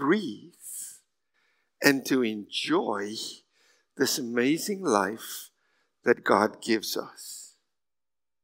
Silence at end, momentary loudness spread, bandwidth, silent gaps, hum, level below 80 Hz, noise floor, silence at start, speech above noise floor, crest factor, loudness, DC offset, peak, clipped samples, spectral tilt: 0.95 s; 17 LU; 16 kHz; none; none; -84 dBFS; under -90 dBFS; 0 s; over 63 dB; 28 dB; -27 LUFS; under 0.1%; -2 dBFS; under 0.1%; -3.5 dB/octave